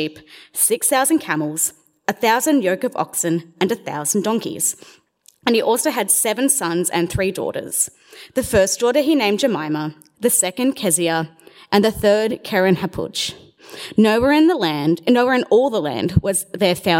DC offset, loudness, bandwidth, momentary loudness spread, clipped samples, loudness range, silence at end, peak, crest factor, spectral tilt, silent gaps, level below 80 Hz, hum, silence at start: under 0.1%; -18 LUFS; 16.5 kHz; 9 LU; under 0.1%; 3 LU; 0 s; 0 dBFS; 18 dB; -3.5 dB/octave; none; -46 dBFS; none; 0 s